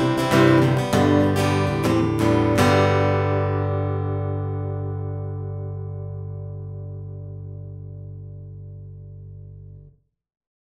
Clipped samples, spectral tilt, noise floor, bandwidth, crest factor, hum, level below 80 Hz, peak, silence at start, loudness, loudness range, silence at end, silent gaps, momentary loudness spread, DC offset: under 0.1%; -7 dB/octave; -52 dBFS; 16 kHz; 20 dB; 50 Hz at -45 dBFS; -46 dBFS; -2 dBFS; 0 s; -21 LUFS; 19 LU; 0.8 s; none; 22 LU; under 0.1%